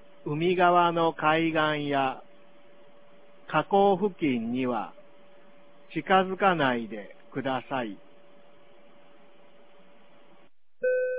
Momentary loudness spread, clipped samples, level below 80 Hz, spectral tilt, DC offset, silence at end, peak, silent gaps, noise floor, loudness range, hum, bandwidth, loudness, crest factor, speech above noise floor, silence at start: 15 LU; under 0.1%; -68 dBFS; -9.5 dB/octave; 0.4%; 0 s; -8 dBFS; none; -63 dBFS; 12 LU; none; 4 kHz; -26 LUFS; 20 dB; 37 dB; 0.25 s